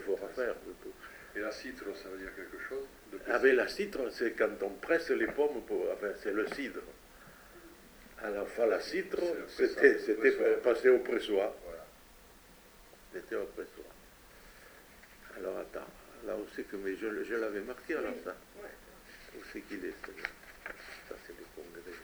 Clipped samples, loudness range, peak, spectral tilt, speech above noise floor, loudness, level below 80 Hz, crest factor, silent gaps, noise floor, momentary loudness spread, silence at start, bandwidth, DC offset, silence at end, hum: under 0.1%; 16 LU; -10 dBFS; -4.5 dB/octave; 25 dB; -33 LUFS; -62 dBFS; 26 dB; none; -58 dBFS; 26 LU; 0 s; over 20 kHz; under 0.1%; 0 s; none